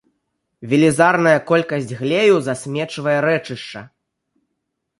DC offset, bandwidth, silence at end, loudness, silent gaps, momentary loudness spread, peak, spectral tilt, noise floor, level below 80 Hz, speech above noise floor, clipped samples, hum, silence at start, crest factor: under 0.1%; 11.5 kHz; 1.15 s; -17 LUFS; none; 17 LU; -2 dBFS; -5.5 dB/octave; -76 dBFS; -62 dBFS; 59 dB; under 0.1%; none; 0.6 s; 18 dB